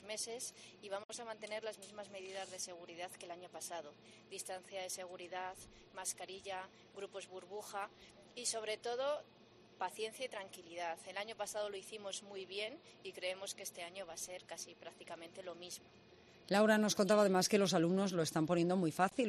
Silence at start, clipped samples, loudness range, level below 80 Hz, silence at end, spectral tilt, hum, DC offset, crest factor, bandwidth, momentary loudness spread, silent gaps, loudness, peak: 0 s; under 0.1%; 13 LU; -80 dBFS; 0 s; -4 dB/octave; none; under 0.1%; 20 dB; 13 kHz; 18 LU; 1.05-1.09 s; -40 LUFS; -20 dBFS